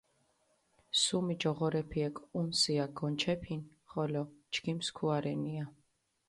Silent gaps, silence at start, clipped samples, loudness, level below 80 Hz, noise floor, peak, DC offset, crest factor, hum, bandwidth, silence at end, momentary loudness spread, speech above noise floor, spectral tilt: none; 0.95 s; under 0.1%; -34 LUFS; -64 dBFS; -74 dBFS; -16 dBFS; under 0.1%; 20 dB; none; 11.5 kHz; 0.6 s; 10 LU; 40 dB; -4.5 dB/octave